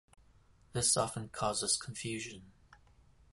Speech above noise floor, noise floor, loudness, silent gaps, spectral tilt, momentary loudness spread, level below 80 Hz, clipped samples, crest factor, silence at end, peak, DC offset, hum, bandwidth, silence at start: 29 dB; -64 dBFS; -34 LUFS; none; -2.5 dB/octave; 13 LU; -62 dBFS; under 0.1%; 22 dB; 0.6 s; -16 dBFS; under 0.1%; none; 12 kHz; 0.75 s